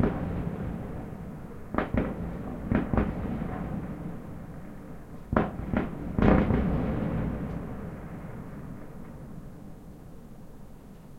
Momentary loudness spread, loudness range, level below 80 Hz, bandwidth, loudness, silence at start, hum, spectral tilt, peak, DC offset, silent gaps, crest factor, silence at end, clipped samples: 20 LU; 12 LU; -40 dBFS; 16 kHz; -31 LUFS; 0 s; none; -9 dB/octave; -4 dBFS; under 0.1%; none; 28 dB; 0 s; under 0.1%